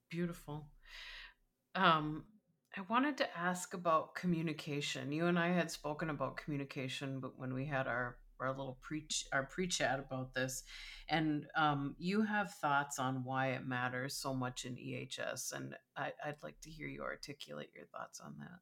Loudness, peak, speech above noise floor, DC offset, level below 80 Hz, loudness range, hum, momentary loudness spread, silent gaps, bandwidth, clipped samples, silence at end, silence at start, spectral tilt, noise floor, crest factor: -39 LUFS; -16 dBFS; 26 dB; under 0.1%; -66 dBFS; 7 LU; none; 15 LU; none; 17.5 kHz; under 0.1%; 0.05 s; 0.1 s; -4.5 dB/octave; -65 dBFS; 22 dB